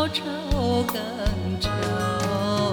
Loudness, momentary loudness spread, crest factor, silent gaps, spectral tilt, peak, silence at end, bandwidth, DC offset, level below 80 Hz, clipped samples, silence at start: -25 LUFS; 4 LU; 14 dB; none; -5.5 dB/octave; -10 dBFS; 0 s; 19.5 kHz; under 0.1%; -34 dBFS; under 0.1%; 0 s